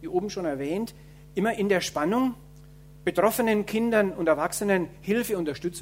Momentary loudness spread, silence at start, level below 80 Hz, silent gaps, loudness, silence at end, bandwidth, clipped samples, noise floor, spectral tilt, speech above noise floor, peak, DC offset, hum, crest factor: 7 LU; 0 s; -54 dBFS; none; -26 LUFS; 0 s; 16 kHz; under 0.1%; -48 dBFS; -5 dB/octave; 23 dB; -6 dBFS; under 0.1%; none; 20 dB